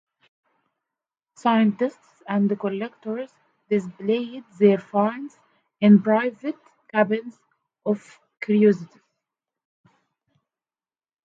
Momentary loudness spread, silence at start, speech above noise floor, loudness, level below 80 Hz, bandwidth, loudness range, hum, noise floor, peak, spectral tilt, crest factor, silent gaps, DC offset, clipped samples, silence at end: 16 LU; 1.45 s; over 69 dB; -22 LUFS; -74 dBFS; 7.4 kHz; 5 LU; none; under -90 dBFS; -4 dBFS; -8 dB/octave; 20 dB; none; under 0.1%; under 0.1%; 2.4 s